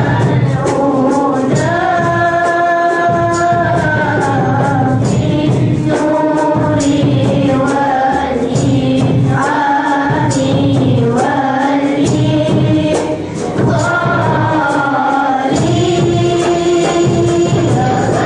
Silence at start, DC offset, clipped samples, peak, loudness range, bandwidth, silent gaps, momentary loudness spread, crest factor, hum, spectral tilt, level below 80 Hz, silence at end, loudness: 0 s; under 0.1%; under 0.1%; -4 dBFS; 1 LU; 10.5 kHz; none; 1 LU; 8 dB; none; -6.5 dB/octave; -38 dBFS; 0 s; -12 LUFS